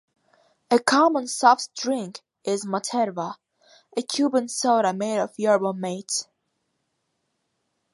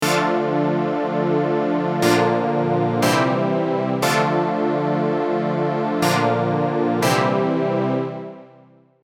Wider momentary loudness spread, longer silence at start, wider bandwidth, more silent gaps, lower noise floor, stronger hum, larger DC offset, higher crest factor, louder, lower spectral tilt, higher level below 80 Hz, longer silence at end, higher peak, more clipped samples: first, 13 LU vs 4 LU; first, 0.7 s vs 0 s; second, 11.5 kHz vs 17.5 kHz; neither; first, -76 dBFS vs -51 dBFS; neither; neither; about the same, 22 dB vs 18 dB; second, -23 LUFS vs -20 LUFS; second, -3.5 dB/octave vs -5.5 dB/octave; second, -78 dBFS vs -68 dBFS; first, 1.7 s vs 0.6 s; about the same, -4 dBFS vs -2 dBFS; neither